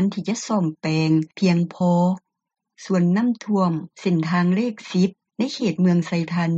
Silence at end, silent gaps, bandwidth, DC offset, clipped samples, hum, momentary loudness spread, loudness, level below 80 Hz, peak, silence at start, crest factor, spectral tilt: 0 s; none; 7.8 kHz; under 0.1%; under 0.1%; none; 6 LU; -21 LUFS; -66 dBFS; -8 dBFS; 0 s; 14 dB; -7 dB/octave